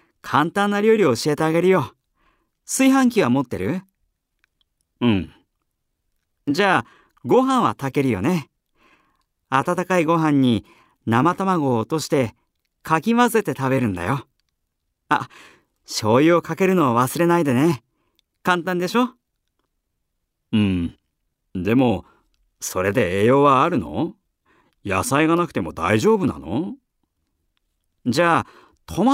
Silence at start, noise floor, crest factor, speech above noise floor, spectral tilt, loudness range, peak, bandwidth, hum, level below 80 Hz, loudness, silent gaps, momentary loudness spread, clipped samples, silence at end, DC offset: 0.25 s; -75 dBFS; 18 dB; 56 dB; -5.5 dB/octave; 5 LU; -2 dBFS; 16 kHz; none; -54 dBFS; -20 LUFS; none; 11 LU; under 0.1%; 0 s; under 0.1%